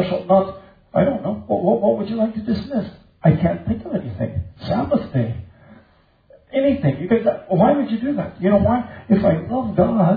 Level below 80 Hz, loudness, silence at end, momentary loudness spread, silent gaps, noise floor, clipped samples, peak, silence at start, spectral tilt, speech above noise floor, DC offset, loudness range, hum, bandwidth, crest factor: -44 dBFS; -20 LUFS; 0 s; 9 LU; none; -55 dBFS; under 0.1%; -4 dBFS; 0 s; -11 dB/octave; 37 dB; under 0.1%; 5 LU; none; 5 kHz; 16 dB